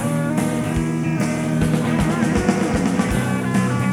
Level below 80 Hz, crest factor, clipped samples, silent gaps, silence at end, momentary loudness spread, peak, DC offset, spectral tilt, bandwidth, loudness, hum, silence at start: -36 dBFS; 16 dB; under 0.1%; none; 0 s; 2 LU; -2 dBFS; under 0.1%; -6.5 dB/octave; 16 kHz; -20 LUFS; none; 0 s